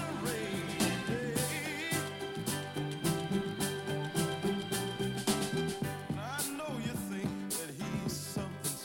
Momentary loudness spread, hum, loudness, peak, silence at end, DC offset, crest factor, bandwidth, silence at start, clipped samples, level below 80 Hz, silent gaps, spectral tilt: 5 LU; none; -35 LUFS; -16 dBFS; 0 s; under 0.1%; 18 dB; 17 kHz; 0 s; under 0.1%; -62 dBFS; none; -4 dB/octave